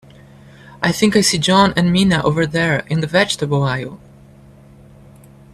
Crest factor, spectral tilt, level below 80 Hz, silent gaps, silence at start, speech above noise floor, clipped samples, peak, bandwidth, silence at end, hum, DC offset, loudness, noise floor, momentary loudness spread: 18 dB; -4.5 dB/octave; -46 dBFS; none; 0.7 s; 28 dB; under 0.1%; 0 dBFS; 14 kHz; 1.6 s; none; under 0.1%; -16 LUFS; -43 dBFS; 8 LU